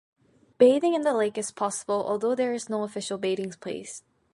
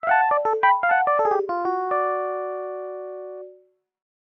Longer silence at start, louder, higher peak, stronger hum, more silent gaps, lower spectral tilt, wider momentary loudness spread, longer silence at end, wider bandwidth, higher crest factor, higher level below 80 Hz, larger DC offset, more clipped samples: first, 0.6 s vs 0.05 s; second, -26 LUFS vs -22 LUFS; about the same, -6 dBFS vs -6 dBFS; neither; neither; second, -4 dB/octave vs -5.5 dB/octave; about the same, 15 LU vs 16 LU; second, 0.35 s vs 0.85 s; first, 11.5 kHz vs 6 kHz; about the same, 20 dB vs 18 dB; about the same, -74 dBFS vs -74 dBFS; neither; neither